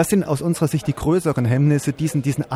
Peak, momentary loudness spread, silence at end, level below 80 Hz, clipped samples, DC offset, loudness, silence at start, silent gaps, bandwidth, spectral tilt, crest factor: -4 dBFS; 4 LU; 0 s; -44 dBFS; under 0.1%; under 0.1%; -20 LUFS; 0 s; none; 16 kHz; -7 dB/octave; 14 dB